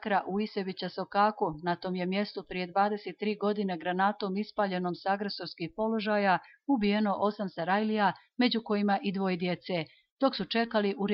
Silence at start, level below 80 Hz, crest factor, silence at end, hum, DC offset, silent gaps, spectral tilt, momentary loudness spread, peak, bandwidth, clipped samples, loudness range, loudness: 0 s; -66 dBFS; 16 dB; 0 s; none; under 0.1%; 10.11-10.17 s; -4 dB/octave; 7 LU; -14 dBFS; 5.8 kHz; under 0.1%; 2 LU; -30 LUFS